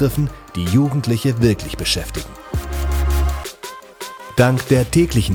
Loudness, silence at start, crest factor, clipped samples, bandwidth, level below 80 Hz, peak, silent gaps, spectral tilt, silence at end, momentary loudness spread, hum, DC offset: -19 LUFS; 0 s; 16 dB; under 0.1%; 20 kHz; -26 dBFS; -2 dBFS; none; -5.5 dB/octave; 0 s; 15 LU; none; under 0.1%